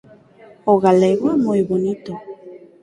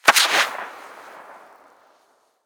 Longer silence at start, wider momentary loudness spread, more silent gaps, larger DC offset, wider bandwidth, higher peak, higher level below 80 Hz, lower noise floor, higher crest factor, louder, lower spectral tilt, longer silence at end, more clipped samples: first, 0.65 s vs 0.05 s; second, 19 LU vs 27 LU; neither; neither; second, 11 kHz vs over 20 kHz; about the same, -2 dBFS vs -2 dBFS; first, -58 dBFS vs -74 dBFS; second, -46 dBFS vs -62 dBFS; second, 16 dB vs 22 dB; about the same, -17 LUFS vs -17 LUFS; first, -8 dB/octave vs 1 dB/octave; second, 0.25 s vs 1.15 s; neither